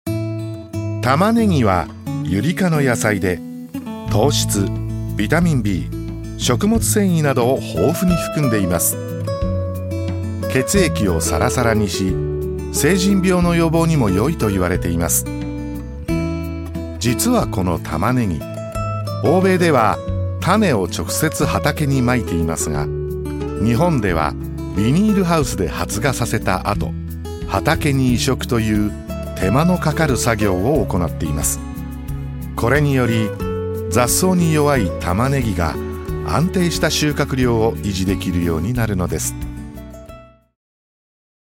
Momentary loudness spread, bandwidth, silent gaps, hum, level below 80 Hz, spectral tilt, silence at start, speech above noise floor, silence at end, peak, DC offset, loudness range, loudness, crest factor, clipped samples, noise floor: 11 LU; 17 kHz; none; none; -32 dBFS; -5.5 dB/octave; 0.05 s; 24 dB; 1.35 s; -2 dBFS; under 0.1%; 3 LU; -18 LUFS; 16 dB; under 0.1%; -41 dBFS